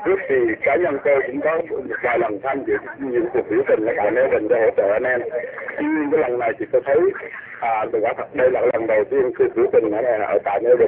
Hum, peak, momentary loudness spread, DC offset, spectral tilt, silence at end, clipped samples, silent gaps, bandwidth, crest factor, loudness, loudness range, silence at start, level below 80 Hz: none; -4 dBFS; 7 LU; under 0.1%; -10 dB/octave; 0 s; under 0.1%; none; 4 kHz; 14 dB; -20 LUFS; 2 LU; 0 s; -56 dBFS